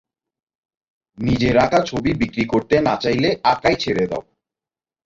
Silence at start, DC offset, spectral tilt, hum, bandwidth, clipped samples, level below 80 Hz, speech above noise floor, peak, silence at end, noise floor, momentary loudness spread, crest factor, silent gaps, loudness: 1.2 s; under 0.1%; -6 dB/octave; none; 7.8 kHz; under 0.1%; -44 dBFS; over 72 dB; -2 dBFS; 0.85 s; under -90 dBFS; 6 LU; 18 dB; none; -19 LUFS